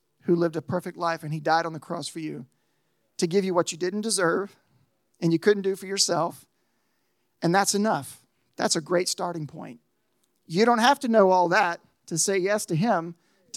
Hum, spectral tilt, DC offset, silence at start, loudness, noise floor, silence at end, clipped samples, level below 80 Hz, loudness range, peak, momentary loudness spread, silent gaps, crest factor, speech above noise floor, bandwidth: none; -4 dB/octave; under 0.1%; 0.25 s; -24 LUFS; -74 dBFS; 0 s; under 0.1%; -82 dBFS; 5 LU; -6 dBFS; 16 LU; none; 20 dB; 49 dB; 16 kHz